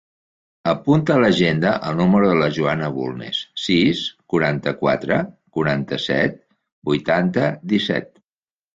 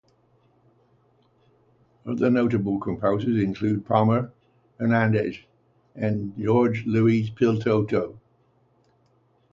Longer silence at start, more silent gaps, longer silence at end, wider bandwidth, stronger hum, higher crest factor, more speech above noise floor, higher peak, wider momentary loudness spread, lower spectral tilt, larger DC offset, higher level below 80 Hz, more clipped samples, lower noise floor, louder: second, 0.65 s vs 2.05 s; first, 6.72-6.82 s vs none; second, 0.7 s vs 1.35 s; about the same, 7.8 kHz vs 7.2 kHz; second, none vs 60 Hz at -45 dBFS; about the same, 16 dB vs 20 dB; first, over 71 dB vs 41 dB; about the same, -4 dBFS vs -4 dBFS; about the same, 9 LU vs 9 LU; second, -6.5 dB/octave vs -9 dB/octave; neither; about the same, -52 dBFS vs -56 dBFS; neither; first, under -90 dBFS vs -64 dBFS; first, -19 LUFS vs -23 LUFS